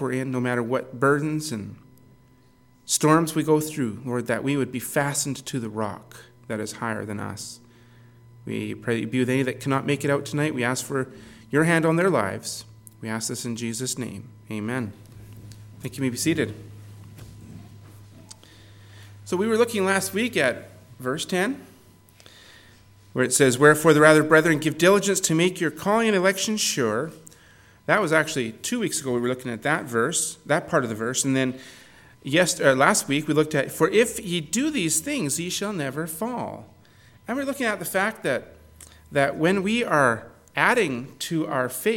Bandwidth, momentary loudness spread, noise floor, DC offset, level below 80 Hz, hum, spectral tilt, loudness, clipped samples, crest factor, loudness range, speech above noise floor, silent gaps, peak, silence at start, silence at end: 17.5 kHz; 16 LU; -56 dBFS; under 0.1%; -62 dBFS; none; -4 dB/octave; -23 LUFS; under 0.1%; 24 dB; 11 LU; 33 dB; none; 0 dBFS; 0 s; 0 s